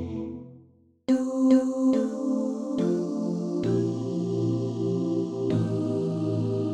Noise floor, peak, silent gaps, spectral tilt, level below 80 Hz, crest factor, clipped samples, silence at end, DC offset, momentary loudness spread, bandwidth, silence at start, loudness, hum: -57 dBFS; -10 dBFS; none; -8.5 dB/octave; -62 dBFS; 16 dB; under 0.1%; 0 s; under 0.1%; 8 LU; 9.2 kHz; 0 s; -26 LUFS; none